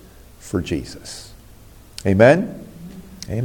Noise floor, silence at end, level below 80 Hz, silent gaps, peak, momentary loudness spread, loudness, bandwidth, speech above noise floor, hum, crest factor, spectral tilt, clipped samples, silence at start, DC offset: -44 dBFS; 0 s; -46 dBFS; none; -2 dBFS; 25 LU; -18 LUFS; 17 kHz; 27 dB; none; 20 dB; -6.5 dB/octave; under 0.1%; 0.45 s; under 0.1%